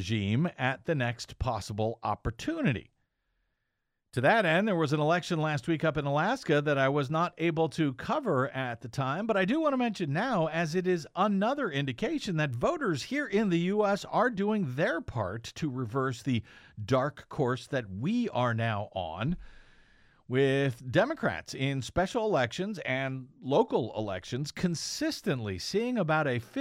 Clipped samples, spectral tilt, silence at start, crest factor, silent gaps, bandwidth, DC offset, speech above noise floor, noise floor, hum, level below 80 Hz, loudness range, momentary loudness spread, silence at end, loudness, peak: under 0.1%; -6 dB/octave; 0 s; 18 dB; none; 15.5 kHz; under 0.1%; 52 dB; -82 dBFS; none; -56 dBFS; 4 LU; 7 LU; 0 s; -30 LUFS; -12 dBFS